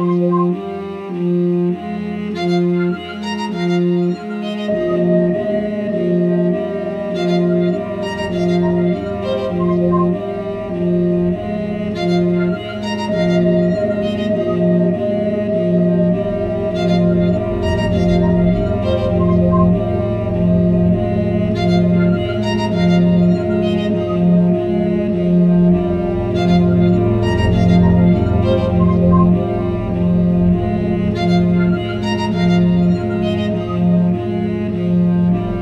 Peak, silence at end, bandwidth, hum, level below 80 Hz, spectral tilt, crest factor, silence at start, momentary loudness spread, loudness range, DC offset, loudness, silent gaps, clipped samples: -2 dBFS; 0 s; 6.6 kHz; none; -34 dBFS; -9 dB/octave; 14 dB; 0 s; 7 LU; 4 LU; under 0.1%; -16 LUFS; none; under 0.1%